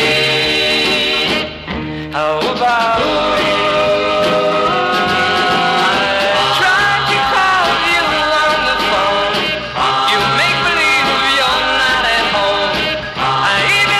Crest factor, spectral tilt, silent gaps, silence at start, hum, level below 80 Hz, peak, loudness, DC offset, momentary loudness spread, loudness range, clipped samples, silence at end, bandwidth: 8 dB; -3 dB/octave; none; 0 s; none; -40 dBFS; -6 dBFS; -13 LUFS; under 0.1%; 5 LU; 2 LU; under 0.1%; 0 s; 14.5 kHz